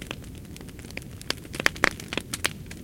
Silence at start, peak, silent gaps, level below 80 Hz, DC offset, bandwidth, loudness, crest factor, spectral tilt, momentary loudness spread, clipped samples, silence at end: 0 s; 0 dBFS; none; -48 dBFS; under 0.1%; 17 kHz; -29 LUFS; 32 dB; -2.5 dB/octave; 18 LU; under 0.1%; 0 s